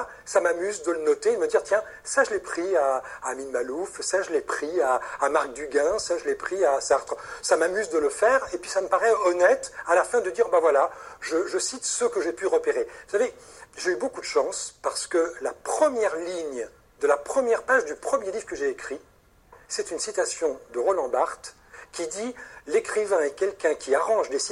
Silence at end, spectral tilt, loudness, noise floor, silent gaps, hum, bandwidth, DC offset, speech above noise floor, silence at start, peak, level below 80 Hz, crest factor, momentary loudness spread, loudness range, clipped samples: 0 s; -1.5 dB/octave; -25 LUFS; -55 dBFS; none; none; 12.5 kHz; under 0.1%; 30 dB; 0 s; -6 dBFS; -62 dBFS; 18 dB; 10 LU; 5 LU; under 0.1%